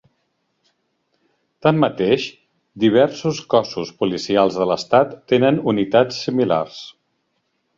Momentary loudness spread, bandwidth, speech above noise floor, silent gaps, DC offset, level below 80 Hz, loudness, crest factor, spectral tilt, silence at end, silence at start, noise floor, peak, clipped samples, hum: 8 LU; 7.6 kHz; 52 dB; none; under 0.1%; -58 dBFS; -18 LUFS; 18 dB; -6 dB/octave; 0.85 s; 1.65 s; -70 dBFS; -2 dBFS; under 0.1%; none